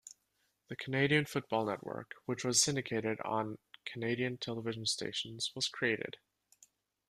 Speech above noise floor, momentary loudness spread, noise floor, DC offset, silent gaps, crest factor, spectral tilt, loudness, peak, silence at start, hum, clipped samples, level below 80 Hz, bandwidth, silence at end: 44 dB; 15 LU; -79 dBFS; under 0.1%; none; 22 dB; -3 dB/octave; -35 LUFS; -14 dBFS; 0.05 s; none; under 0.1%; -74 dBFS; 14.5 kHz; 0.95 s